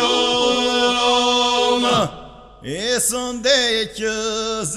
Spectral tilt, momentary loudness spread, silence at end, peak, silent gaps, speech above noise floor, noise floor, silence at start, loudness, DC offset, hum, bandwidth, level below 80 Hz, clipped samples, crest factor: -2 dB/octave; 7 LU; 0 s; -4 dBFS; none; 18 dB; -39 dBFS; 0 s; -17 LUFS; under 0.1%; none; 15 kHz; -48 dBFS; under 0.1%; 16 dB